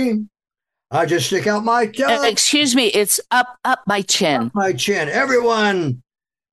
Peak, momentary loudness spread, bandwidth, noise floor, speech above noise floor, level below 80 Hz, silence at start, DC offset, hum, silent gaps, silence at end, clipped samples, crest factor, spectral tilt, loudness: -2 dBFS; 7 LU; 13 kHz; -85 dBFS; 68 dB; -62 dBFS; 0 s; under 0.1%; none; none; 0.55 s; under 0.1%; 16 dB; -3 dB/octave; -17 LUFS